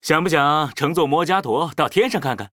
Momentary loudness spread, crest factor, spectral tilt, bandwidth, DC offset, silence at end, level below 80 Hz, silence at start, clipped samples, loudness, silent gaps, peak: 4 LU; 18 dB; -5 dB/octave; 18.5 kHz; under 0.1%; 0.05 s; -56 dBFS; 0.05 s; under 0.1%; -19 LUFS; none; 0 dBFS